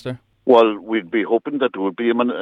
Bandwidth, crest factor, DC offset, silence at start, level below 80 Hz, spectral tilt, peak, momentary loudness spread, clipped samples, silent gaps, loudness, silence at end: 6 kHz; 16 dB; under 0.1%; 0.05 s; -66 dBFS; -7.5 dB/octave; -2 dBFS; 10 LU; under 0.1%; none; -18 LUFS; 0 s